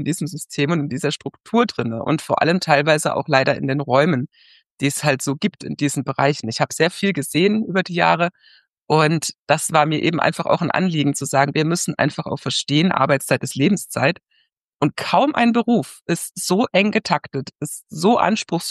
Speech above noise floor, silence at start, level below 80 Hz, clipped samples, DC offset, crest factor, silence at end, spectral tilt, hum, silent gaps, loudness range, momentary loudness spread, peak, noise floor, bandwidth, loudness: 46 dB; 0 s; -64 dBFS; under 0.1%; under 0.1%; 18 dB; 0 s; -5 dB/octave; none; 4.66-4.75 s, 8.73-8.86 s, 9.39-9.46 s, 14.53-14.72 s; 2 LU; 8 LU; -2 dBFS; -65 dBFS; 12.5 kHz; -19 LUFS